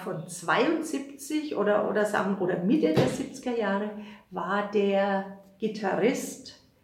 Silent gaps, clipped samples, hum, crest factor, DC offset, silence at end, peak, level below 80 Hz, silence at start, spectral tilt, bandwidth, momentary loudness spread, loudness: none; under 0.1%; none; 18 dB; under 0.1%; 0.3 s; -10 dBFS; -66 dBFS; 0 s; -5.5 dB/octave; 16.5 kHz; 11 LU; -28 LUFS